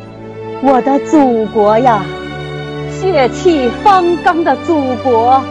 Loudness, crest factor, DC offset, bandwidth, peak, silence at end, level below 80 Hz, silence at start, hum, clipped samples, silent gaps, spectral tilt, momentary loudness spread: -12 LUFS; 12 dB; under 0.1%; 10 kHz; 0 dBFS; 0 s; -40 dBFS; 0 s; none; under 0.1%; none; -6 dB/octave; 13 LU